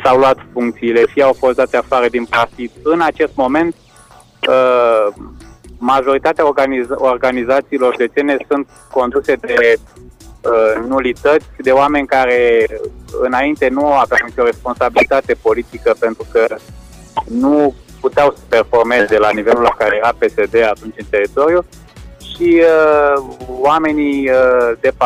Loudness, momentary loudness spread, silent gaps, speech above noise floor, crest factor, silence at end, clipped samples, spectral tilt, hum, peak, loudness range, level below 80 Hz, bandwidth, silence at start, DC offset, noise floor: -13 LUFS; 8 LU; none; 30 dB; 12 dB; 0 s; under 0.1%; -5.5 dB/octave; none; -2 dBFS; 2 LU; -40 dBFS; 13.5 kHz; 0 s; under 0.1%; -43 dBFS